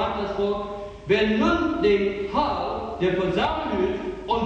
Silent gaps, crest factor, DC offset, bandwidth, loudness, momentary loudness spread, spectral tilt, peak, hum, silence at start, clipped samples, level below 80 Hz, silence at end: none; 16 dB; under 0.1%; 8 kHz; -24 LUFS; 8 LU; -6.5 dB/octave; -8 dBFS; none; 0 s; under 0.1%; -42 dBFS; 0 s